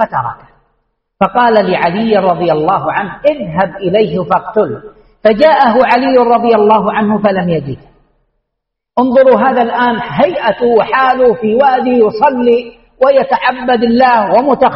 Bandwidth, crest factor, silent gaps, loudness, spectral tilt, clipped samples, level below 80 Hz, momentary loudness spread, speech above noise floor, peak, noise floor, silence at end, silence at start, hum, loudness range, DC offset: 5.8 kHz; 10 dB; none; -11 LUFS; -8.5 dB/octave; under 0.1%; -46 dBFS; 7 LU; 65 dB; 0 dBFS; -75 dBFS; 0 s; 0 s; none; 3 LU; under 0.1%